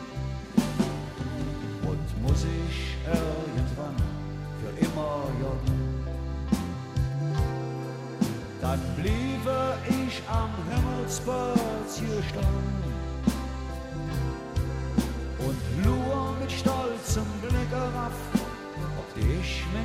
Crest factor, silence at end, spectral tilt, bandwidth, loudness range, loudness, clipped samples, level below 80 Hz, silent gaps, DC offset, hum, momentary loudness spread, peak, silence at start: 20 dB; 0 s; -6.5 dB/octave; 16 kHz; 2 LU; -30 LUFS; under 0.1%; -36 dBFS; none; under 0.1%; none; 7 LU; -8 dBFS; 0 s